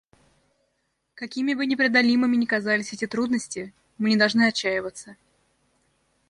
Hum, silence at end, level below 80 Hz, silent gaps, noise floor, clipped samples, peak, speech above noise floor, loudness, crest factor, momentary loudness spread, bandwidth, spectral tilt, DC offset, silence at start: none; 1.15 s; -68 dBFS; none; -74 dBFS; under 0.1%; -6 dBFS; 51 dB; -23 LUFS; 18 dB; 16 LU; 11 kHz; -4 dB/octave; under 0.1%; 1.2 s